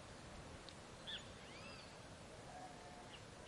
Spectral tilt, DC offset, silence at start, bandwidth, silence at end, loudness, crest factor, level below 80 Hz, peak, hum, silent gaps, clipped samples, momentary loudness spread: -3.5 dB/octave; under 0.1%; 0 s; 12 kHz; 0 s; -54 LUFS; 18 dB; -68 dBFS; -36 dBFS; none; none; under 0.1%; 6 LU